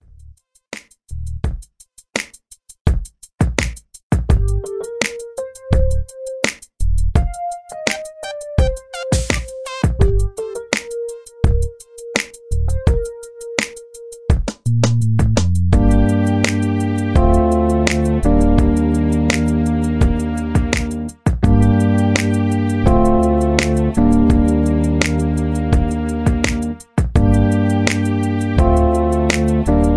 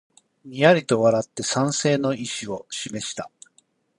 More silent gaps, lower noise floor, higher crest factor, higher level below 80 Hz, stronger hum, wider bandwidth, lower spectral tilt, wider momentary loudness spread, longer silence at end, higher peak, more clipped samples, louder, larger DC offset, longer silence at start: first, 2.81-2.85 s, 4.03-4.10 s vs none; second, -48 dBFS vs -63 dBFS; about the same, 16 dB vs 20 dB; first, -22 dBFS vs -64 dBFS; neither; about the same, 11 kHz vs 11 kHz; first, -6.5 dB/octave vs -4.5 dB/octave; about the same, 13 LU vs 14 LU; second, 0 s vs 0.7 s; about the same, 0 dBFS vs -2 dBFS; neither; first, -17 LUFS vs -22 LUFS; neither; second, 0 s vs 0.45 s